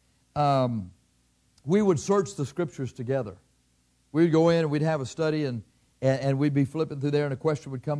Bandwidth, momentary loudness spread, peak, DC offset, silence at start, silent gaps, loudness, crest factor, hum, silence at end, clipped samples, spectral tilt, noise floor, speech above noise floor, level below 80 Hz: 11 kHz; 11 LU; -10 dBFS; under 0.1%; 0.35 s; none; -26 LUFS; 16 dB; 60 Hz at -60 dBFS; 0 s; under 0.1%; -7 dB/octave; -67 dBFS; 42 dB; -62 dBFS